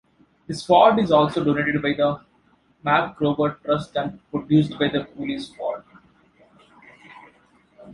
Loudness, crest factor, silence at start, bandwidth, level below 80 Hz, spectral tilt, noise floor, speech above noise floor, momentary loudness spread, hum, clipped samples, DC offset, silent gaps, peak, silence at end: -21 LUFS; 20 dB; 0.5 s; 11 kHz; -56 dBFS; -7 dB/octave; -60 dBFS; 40 dB; 15 LU; none; under 0.1%; under 0.1%; none; -2 dBFS; 0 s